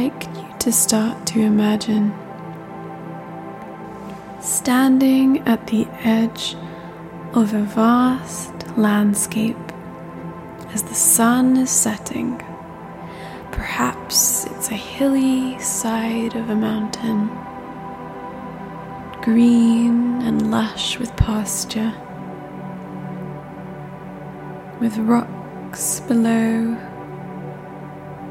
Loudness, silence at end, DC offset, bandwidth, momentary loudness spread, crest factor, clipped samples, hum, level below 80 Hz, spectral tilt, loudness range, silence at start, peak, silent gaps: -18 LUFS; 0 s; under 0.1%; 16.5 kHz; 19 LU; 18 dB; under 0.1%; none; -42 dBFS; -4 dB/octave; 6 LU; 0 s; -2 dBFS; none